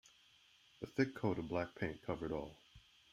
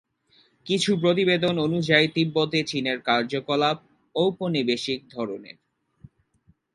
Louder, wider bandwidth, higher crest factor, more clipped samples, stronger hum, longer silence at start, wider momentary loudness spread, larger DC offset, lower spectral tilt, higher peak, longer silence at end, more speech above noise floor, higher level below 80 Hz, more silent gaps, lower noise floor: second, -41 LUFS vs -24 LUFS; first, 14 kHz vs 11.5 kHz; about the same, 22 dB vs 22 dB; neither; neither; first, 0.8 s vs 0.65 s; first, 16 LU vs 12 LU; neither; first, -7 dB/octave vs -5 dB/octave; second, -22 dBFS vs -2 dBFS; second, 0.35 s vs 1.3 s; second, 28 dB vs 40 dB; about the same, -66 dBFS vs -64 dBFS; neither; first, -69 dBFS vs -64 dBFS